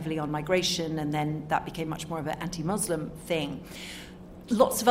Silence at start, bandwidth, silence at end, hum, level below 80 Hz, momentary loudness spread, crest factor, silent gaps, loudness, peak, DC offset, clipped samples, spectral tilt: 0 s; 16 kHz; 0 s; none; -54 dBFS; 14 LU; 22 dB; none; -29 LUFS; -6 dBFS; under 0.1%; under 0.1%; -4.5 dB/octave